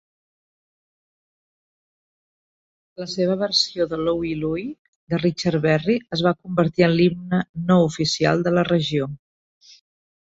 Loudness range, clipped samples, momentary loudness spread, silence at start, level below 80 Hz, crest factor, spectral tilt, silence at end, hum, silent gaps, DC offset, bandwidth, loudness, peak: 6 LU; under 0.1%; 9 LU; 3 s; -54 dBFS; 18 dB; -6 dB/octave; 1.1 s; none; 4.79-5.07 s, 7.49-7.54 s; under 0.1%; 8 kHz; -21 LUFS; -4 dBFS